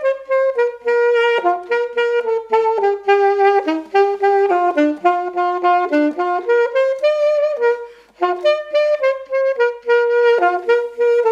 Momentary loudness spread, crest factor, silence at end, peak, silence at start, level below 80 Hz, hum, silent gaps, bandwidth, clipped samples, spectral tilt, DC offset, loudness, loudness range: 5 LU; 14 dB; 0 s; -2 dBFS; 0 s; -68 dBFS; 50 Hz at -65 dBFS; none; 7.8 kHz; under 0.1%; -3.5 dB/octave; under 0.1%; -16 LUFS; 2 LU